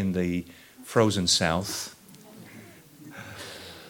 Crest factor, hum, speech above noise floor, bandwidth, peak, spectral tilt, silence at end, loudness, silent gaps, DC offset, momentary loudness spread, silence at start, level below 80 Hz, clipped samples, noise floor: 24 dB; none; 23 dB; 19 kHz; -6 dBFS; -4 dB/octave; 0 s; -25 LUFS; none; under 0.1%; 24 LU; 0 s; -56 dBFS; under 0.1%; -49 dBFS